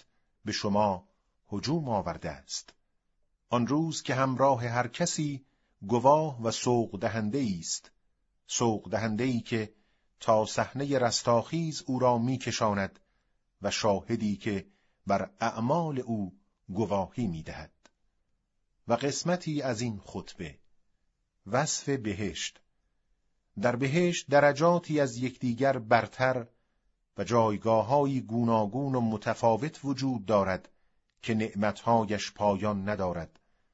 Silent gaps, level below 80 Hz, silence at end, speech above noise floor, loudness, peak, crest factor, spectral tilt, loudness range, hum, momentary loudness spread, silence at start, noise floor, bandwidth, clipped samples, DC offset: none; -62 dBFS; 0.45 s; 47 dB; -29 LUFS; -8 dBFS; 22 dB; -5 dB/octave; 6 LU; none; 12 LU; 0.45 s; -75 dBFS; 8 kHz; under 0.1%; under 0.1%